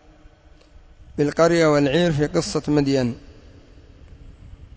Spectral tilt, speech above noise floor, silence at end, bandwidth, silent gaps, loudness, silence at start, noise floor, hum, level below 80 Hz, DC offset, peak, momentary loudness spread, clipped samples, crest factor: -6 dB/octave; 31 dB; 0.1 s; 8 kHz; none; -20 LUFS; 1.15 s; -49 dBFS; none; -44 dBFS; under 0.1%; -6 dBFS; 10 LU; under 0.1%; 16 dB